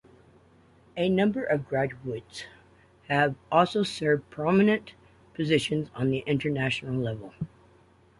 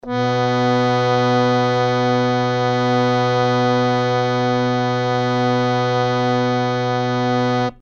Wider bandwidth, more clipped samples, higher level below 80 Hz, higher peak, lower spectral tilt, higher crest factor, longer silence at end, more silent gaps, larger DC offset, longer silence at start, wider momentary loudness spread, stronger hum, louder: first, 11.5 kHz vs 7.4 kHz; neither; second, -60 dBFS vs -50 dBFS; about the same, -6 dBFS vs -4 dBFS; about the same, -6.5 dB/octave vs -6.5 dB/octave; first, 22 dB vs 14 dB; first, 0.75 s vs 0.05 s; neither; neither; first, 0.95 s vs 0.05 s; first, 16 LU vs 2 LU; neither; second, -27 LUFS vs -18 LUFS